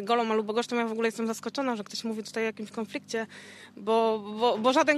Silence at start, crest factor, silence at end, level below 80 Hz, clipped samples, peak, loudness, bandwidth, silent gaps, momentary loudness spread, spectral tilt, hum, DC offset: 0 s; 20 dB; 0 s; -84 dBFS; under 0.1%; -10 dBFS; -29 LUFS; 13.5 kHz; none; 11 LU; -4 dB/octave; none; under 0.1%